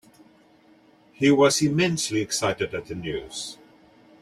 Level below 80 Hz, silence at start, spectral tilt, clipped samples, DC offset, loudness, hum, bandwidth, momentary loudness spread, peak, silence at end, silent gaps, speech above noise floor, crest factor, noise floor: -58 dBFS; 1.2 s; -4 dB/octave; under 0.1%; under 0.1%; -23 LUFS; none; 15 kHz; 15 LU; -6 dBFS; 0.7 s; none; 33 dB; 20 dB; -56 dBFS